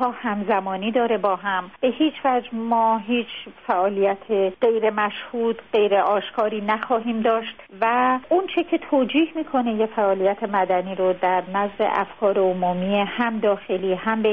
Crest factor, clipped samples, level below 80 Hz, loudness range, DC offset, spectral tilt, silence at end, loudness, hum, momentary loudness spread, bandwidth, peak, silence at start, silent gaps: 14 dB; under 0.1%; -62 dBFS; 1 LU; 0.2%; -3.5 dB/octave; 0 s; -22 LUFS; none; 5 LU; 5 kHz; -8 dBFS; 0 s; none